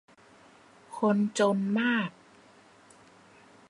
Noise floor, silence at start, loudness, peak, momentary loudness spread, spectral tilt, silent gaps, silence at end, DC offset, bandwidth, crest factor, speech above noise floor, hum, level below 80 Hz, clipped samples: -57 dBFS; 0.9 s; -28 LUFS; -12 dBFS; 9 LU; -5.5 dB/octave; none; 1.6 s; under 0.1%; 11 kHz; 18 dB; 31 dB; none; -78 dBFS; under 0.1%